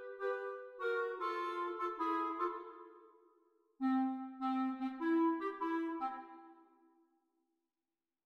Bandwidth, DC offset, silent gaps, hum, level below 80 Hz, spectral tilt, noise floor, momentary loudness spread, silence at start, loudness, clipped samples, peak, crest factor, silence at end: 6.6 kHz; under 0.1%; none; none; -86 dBFS; -5 dB/octave; under -90 dBFS; 14 LU; 0 s; -38 LUFS; under 0.1%; -24 dBFS; 16 dB; 1.65 s